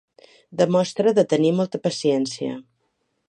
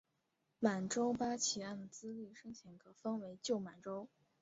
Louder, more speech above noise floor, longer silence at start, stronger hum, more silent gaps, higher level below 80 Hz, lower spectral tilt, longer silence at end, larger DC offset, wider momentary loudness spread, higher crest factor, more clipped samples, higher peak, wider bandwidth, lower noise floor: first, -21 LUFS vs -41 LUFS; first, 51 dB vs 43 dB; about the same, 0.5 s vs 0.6 s; neither; neither; first, -72 dBFS vs -78 dBFS; first, -6 dB/octave vs -4.5 dB/octave; first, 0.7 s vs 0.35 s; neither; second, 12 LU vs 17 LU; second, 18 dB vs 24 dB; neither; first, -4 dBFS vs -18 dBFS; first, 10 kHz vs 7.6 kHz; second, -72 dBFS vs -84 dBFS